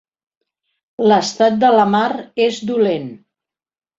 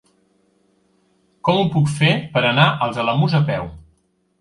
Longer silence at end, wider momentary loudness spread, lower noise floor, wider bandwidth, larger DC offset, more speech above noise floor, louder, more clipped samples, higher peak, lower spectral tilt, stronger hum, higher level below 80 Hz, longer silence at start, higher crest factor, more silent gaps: first, 0.85 s vs 0.6 s; about the same, 8 LU vs 8 LU; first, under -90 dBFS vs -63 dBFS; second, 7.8 kHz vs 11.5 kHz; neither; first, over 75 dB vs 46 dB; about the same, -16 LUFS vs -18 LUFS; neither; about the same, -2 dBFS vs 0 dBFS; second, -5 dB/octave vs -6.5 dB/octave; neither; second, -62 dBFS vs -50 dBFS; second, 1 s vs 1.45 s; about the same, 16 dB vs 20 dB; neither